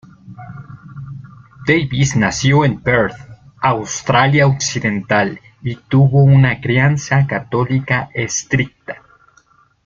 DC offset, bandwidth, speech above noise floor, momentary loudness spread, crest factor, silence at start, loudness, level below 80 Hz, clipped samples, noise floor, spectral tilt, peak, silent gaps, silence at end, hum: under 0.1%; 7.6 kHz; 39 dB; 21 LU; 14 dB; 0.25 s; -15 LUFS; -44 dBFS; under 0.1%; -53 dBFS; -5.5 dB/octave; -2 dBFS; none; 0.9 s; none